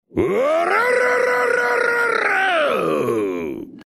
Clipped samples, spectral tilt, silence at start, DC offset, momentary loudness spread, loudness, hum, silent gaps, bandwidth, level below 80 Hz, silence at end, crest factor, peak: under 0.1%; -4.5 dB/octave; 0.15 s; under 0.1%; 5 LU; -18 LUFS; none; none; 15 kHz; -52 dBFS; 0.05 s; 12 dB; -6 dBFS